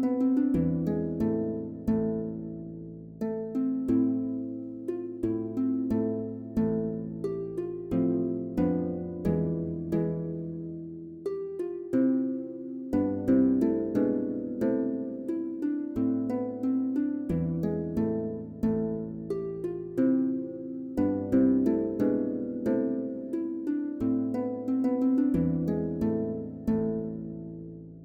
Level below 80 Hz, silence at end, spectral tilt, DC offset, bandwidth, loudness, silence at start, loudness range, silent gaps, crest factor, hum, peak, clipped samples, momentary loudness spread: -54 dBFS; 0 s; -10.5 dB/octave; under 0.1%; 4.6 kHz; -30 LUFS; 0 s; 3 LU; none; 16 dB; none; -14 dBFS; under 0.1%; 10 LU